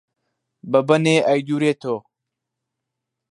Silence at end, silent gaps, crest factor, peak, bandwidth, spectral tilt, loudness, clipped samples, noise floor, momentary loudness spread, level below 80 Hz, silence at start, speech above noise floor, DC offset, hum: 1.3 s; none; 20 dB; -2 dBFS; 11.5 kHz; -6 dB/octave; -19 LUFS; under 0.1%; -82 dBFS; 11 LU; -68 dBFS; 0.65 s; 64 dB; under 0.1%; none